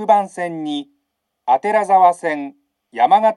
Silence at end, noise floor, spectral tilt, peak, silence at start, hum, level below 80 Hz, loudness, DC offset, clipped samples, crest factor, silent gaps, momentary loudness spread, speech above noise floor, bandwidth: 0 s; -74 dBFS; -5 dB/octave; 0 dBFS; 0 s; none; -82 dBFS; -17 LUFS; under 0.1%; under 0.1%; 16 dB; none; 15 LU; 58 dB; 11.5 kHz